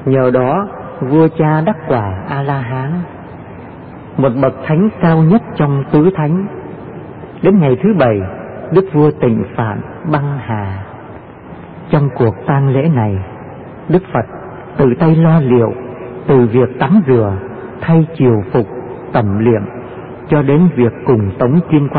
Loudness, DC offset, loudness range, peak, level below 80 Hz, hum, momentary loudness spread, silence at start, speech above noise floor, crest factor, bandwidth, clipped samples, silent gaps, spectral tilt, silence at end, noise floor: -13 LUFS; under 0.1%; 5 LU; 0 dBFS; -44 dBFS; none; 19 LU; 0 s; 20 dB; 12 dB; 4.5 kHz; under 0.1%; none; -14 dB/octave; 0 s; -32 dBFS